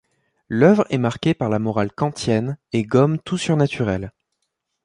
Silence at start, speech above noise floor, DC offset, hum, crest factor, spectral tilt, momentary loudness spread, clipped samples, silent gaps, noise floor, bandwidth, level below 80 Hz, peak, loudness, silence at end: 0.5 s; 57 dB; under 0.1%; none; 18 dB; -7 dB/octave; 9 LU; under 0.1%; none; -76 dBFS; 11 kHz; -50 dBFS; -2 dBFS; -20 LUFS; 0.75 s